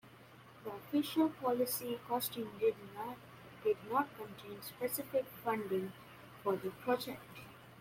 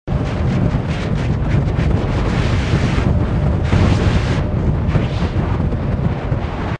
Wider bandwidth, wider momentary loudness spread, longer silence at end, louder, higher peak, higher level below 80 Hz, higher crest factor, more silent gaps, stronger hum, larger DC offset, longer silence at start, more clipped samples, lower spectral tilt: first, 16.5 kHz vs 9.8 kHz; first, 18 LU vs 4 LU; about the same, 0 s vs 0 s; second, -38 LUFS vs -18 LUFS; second, -20 dBFS vs 0 dBFS; second, -76 dBFS vs -22 dBFS; about the same, 18 dB vs 16 dB; neither; neither; neither; about the same, 0.05 s vs 0.05 s; neither; second, -4.5 dB/octave vs -7.5 dB/octave